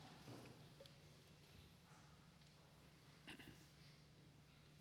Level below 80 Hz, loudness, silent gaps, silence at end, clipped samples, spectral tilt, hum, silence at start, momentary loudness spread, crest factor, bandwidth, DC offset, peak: -80 dBFS; -64 LUFS; none; 0 s; under 0.1%; -4.5 dB/octave; none; 0 s; 8 LU; 22 dB; 17 kHz; under 0.1%; -42 dBFS